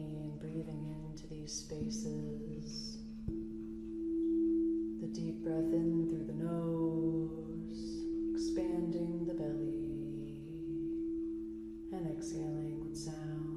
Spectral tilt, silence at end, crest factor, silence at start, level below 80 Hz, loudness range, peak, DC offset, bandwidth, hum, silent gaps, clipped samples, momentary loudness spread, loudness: -7 dB/octave; 0 s; 14 dB; 0 s; -56 dBFS; 7 LU; -24 dBFS; under 0.1%; 11 kHz; none; none; under 0.1%; 11 LU; -39 LUFS